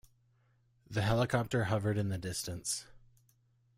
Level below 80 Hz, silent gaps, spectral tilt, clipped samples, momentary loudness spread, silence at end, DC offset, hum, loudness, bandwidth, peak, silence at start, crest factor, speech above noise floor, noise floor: -58 dBFS; none; -5 dB/octave; under 0.1%; 7 LU; 0.8 s; under 0.1%; none; -34 LUFS; 16 kHz; -16 dBFS; 0.9 s; 20 dB; 38 dB; -71 dBFS